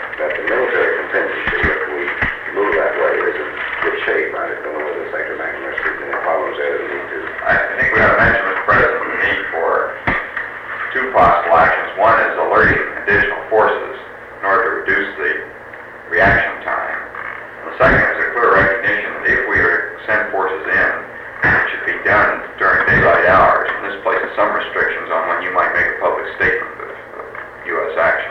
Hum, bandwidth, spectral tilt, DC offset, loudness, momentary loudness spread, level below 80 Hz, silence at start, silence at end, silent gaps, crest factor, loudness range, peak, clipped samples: none; 10.5 kHz; -6.5 dB/octave; under 0.1%; -15 LUFS; 12 LU; -40 dBFS; 0 s; 0 s; none; 14 dB; 5 LU; -4 dBFS; under 0.1%